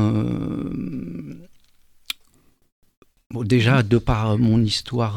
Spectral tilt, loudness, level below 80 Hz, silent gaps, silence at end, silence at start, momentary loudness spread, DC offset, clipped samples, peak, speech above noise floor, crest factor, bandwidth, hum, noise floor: -6.5 dB/octave; -21 LUFS; -40 dBFS; 2.72-2.82 s, 2.97-3.02 s, 3.26-3.30 s; 0 s; 0 s; 17 LU; under 0.1%; under 0.1%; -4 dBFS; 40 dB; 18 dB; 15 kHz; none; -58 dBFS